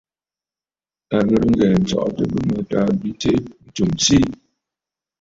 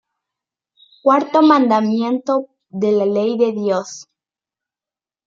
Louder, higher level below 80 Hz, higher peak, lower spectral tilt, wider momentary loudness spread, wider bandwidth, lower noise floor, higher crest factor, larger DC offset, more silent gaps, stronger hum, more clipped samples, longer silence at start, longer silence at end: about the same, -18 LUFS vs -16 LUFS; first, -42 dBFS vs -70 dBFS; about the same, -2 dBFS vs -2 dBFS; about the same, -5.5 dB/octave vs -6 dB/octave; about the same, 8 LU vs 10 LU; about the same, 8 kHz vs 7.6 kHz; about the same, under -90 dBFS vs under -90 dBFS; about the same, 18 dB vs 16 dB; neither; neither; neither; neither; about the same, 1.1 s vs 1.05 s; second, 0.85 s vs 1.25 s